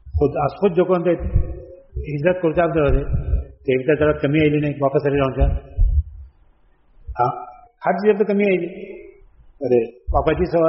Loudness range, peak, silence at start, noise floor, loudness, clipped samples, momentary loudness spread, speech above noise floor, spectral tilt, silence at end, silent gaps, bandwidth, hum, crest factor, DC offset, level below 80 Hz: 3 LU; -4 dBFS; 0.05 s; -55 dBFS; -20 LUFS; under 0.1%; 15 LU; 37 dB; -7 dB/octave; 0 s; none; 5.8 kHz; none; 16 dB; under 0.1%; -26 dBFS